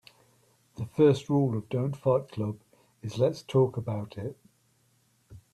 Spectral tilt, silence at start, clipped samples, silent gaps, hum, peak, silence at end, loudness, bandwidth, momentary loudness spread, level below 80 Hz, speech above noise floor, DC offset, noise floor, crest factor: -8 dB/octave; 0.8 s; under 0.1%; none; none; -10 dBFS; 0.15 s; -28 LUFS; 12.5 kHz; 17 LU; -64 dBFS; 41 dB; under 0.1%; -68 dBFS; 20 dB